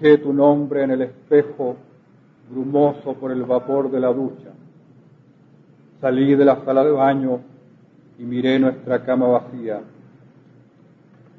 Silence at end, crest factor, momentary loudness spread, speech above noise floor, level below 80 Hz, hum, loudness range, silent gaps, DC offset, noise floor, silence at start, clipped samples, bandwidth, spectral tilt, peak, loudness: 1.55 s; 18 dB; 14 LU; 34 dB; -66 dBFS; none; 4 LU; none; under 0.1%; -52 dBFS; 0 s; under 0.1%; 4.4 kHz; -9.5 dB/octave; -2 dBFS; -19 LUFS